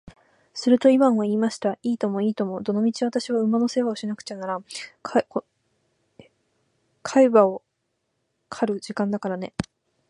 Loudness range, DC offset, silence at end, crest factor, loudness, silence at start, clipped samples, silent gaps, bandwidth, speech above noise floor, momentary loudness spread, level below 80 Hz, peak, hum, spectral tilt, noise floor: 6 LU; under 0.1%; 0.5 s; 22 dB; -23 LUFS; 0.55 s; under 0.1%; none; 11.5 kHz; 53 dB; 16 LU; -62 dBFS; -2 dBFS; none; -6 dB/octave; -76 dBFS